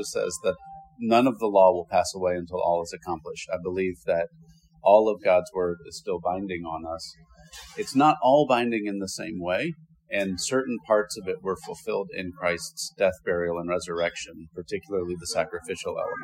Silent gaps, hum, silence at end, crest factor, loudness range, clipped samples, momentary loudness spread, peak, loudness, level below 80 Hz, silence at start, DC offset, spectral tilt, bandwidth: none; none; 0 s; 22 dB; 4 LU; under 0.1%; 15 LU; -4 dBFS; -26 LUFS; -60 dBFS; 0 s; under 0.1%; -4.5 dB/octave; 16 kHz